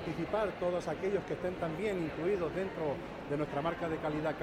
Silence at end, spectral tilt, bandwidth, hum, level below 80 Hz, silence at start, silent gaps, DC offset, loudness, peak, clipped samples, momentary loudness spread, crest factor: 0 s; -7 dB/octave; 15 kHz; none; -56 dBFS; 0 s; none; under 0.1%; -35 LUFS; -20 dBFS; under 0.1%; 4 LU; 14 dB